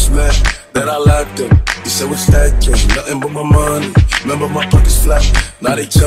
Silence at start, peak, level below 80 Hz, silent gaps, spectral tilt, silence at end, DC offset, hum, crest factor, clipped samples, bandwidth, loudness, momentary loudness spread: 0 s; 0 dBFS; -14 dBFS; none; -4.5 dB/octave; 0 s; under 0.1%; none; 10 dB; under 0.1%; 16 kHz; -13 LUFS; 5 LU